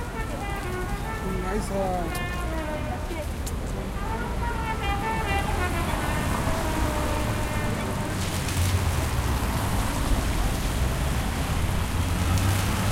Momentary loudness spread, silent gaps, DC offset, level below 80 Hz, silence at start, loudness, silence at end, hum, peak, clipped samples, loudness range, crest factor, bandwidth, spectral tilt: 6 LU; none; under 0.1%; -30 dBFS; 0 s; -27 LUFS; 0 s; none; -12 dBFS; under 0.1%; 3 LU; 14 dB; 16.5 kHz; -5 dB/octave